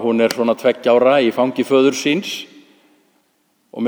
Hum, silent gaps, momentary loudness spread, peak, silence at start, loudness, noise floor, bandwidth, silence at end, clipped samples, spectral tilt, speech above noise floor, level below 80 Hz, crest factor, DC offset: none; none; 11 LU; -2 dBFS; 0 s; -16 LUFS; -63 dBFS; over 20 kHz; 0 s; under 0.1%; -4.5 dB/octave; 47 dB; -72 dBFS; 16 dB; under 0.1%